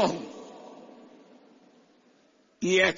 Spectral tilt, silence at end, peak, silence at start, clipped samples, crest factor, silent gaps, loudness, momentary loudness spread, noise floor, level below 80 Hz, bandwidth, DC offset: -3.5 dB/octave; 0 s; -6 dBFS; 0 s; under 0.1%; 24 dB; none; -28 LUFS; 27 LU; -63 dBFS; -72 dBFS; 7.6 kHz; under 0.1%